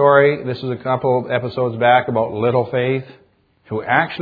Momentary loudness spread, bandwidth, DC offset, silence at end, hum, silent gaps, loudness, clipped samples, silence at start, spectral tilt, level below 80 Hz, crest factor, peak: 10 LU; 5 kHz; under 0.1%; 0 s; none; none; -18 LUFS; under 0.1%; 0 s; -9.5 dB/octave; -58 dBFS; 18 dB; 0 dBFS